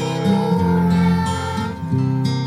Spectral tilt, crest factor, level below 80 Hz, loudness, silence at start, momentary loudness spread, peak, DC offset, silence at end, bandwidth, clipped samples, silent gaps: -7 dB/octave; 12 dB; -42 dBFS; -19 LUFS; 0 s; 6 LU; -6 dBFS; under 0.1%; 0 s; 12.5 kHz; under 0.1%; none